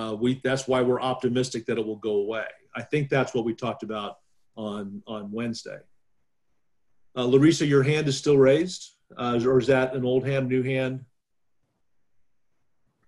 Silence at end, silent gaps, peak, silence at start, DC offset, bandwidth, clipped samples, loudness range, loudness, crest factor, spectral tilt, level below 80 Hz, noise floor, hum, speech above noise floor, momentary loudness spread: 2.05 s; none; -8 dBFS; 0 s; under 0.1%; 11.5 kHz; under 0.1%; 11 LU; -25 LUFS; 18 dB; -6 dB/octave; -60 dBFS; -79 dBFS; none; 55 dB; 17 LU